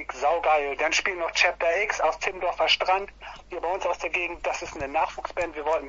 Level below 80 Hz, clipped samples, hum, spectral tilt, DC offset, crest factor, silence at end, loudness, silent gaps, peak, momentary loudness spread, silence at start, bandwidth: -52 dBFS; under 0.1%; none; -1.5 dB/octave; under 0.1%; 18 dB; 0 s; -25 LUFS; none; -8 dBFS; 9 LU; 0 s; 8 kHz